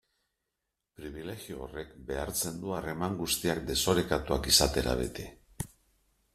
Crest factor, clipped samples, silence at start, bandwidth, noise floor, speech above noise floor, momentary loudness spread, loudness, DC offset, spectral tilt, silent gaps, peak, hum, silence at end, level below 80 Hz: 24 dB; under 0.1%; 1 s; 15.5 kHz; -85 dBFS; 54 dB; 19 LU; -30 LUFS; under 0.1%; -3 dB/octave; none; -8 dBFS; none; 0.7 s; -46 dBFS